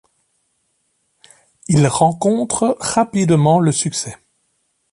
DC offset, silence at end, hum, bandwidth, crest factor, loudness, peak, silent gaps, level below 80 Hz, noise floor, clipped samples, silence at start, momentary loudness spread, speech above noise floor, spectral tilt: under 0.1%; 0.8 s; none; 11.5 kHz; 16 dB; -16 LUFS; -2 dBFS; none; -52 dBFS; -67 dBFS; under 0.1%; 1.7 s; 9 LU; 51 dB; -5.5 dB/octave